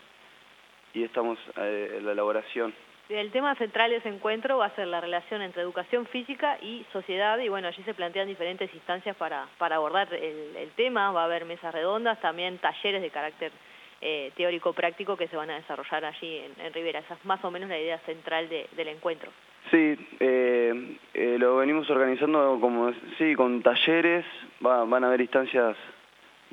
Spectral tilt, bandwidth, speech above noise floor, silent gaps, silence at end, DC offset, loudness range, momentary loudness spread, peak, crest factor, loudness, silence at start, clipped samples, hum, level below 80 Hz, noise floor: -5.5 dB/octave; 7.6 kHz; 28 dB; none; 0.6 s; under 0.1%; 8 LU; 12 LU; -6 dBFS; 22 dB; -28 LUFS; 0.95 s; under 0.1%; none; -82 dBFS; -56 dBFS